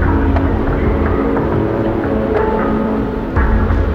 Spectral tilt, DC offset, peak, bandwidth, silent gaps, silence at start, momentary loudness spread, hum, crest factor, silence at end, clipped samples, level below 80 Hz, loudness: -10 dB/octave; under 0.1%; -4 dBFS; 5.8 kHz; none; 0 s; 2 LU; none; 10 dB; 0 s; under 0.1%; -20 dBFS; -16 LUFS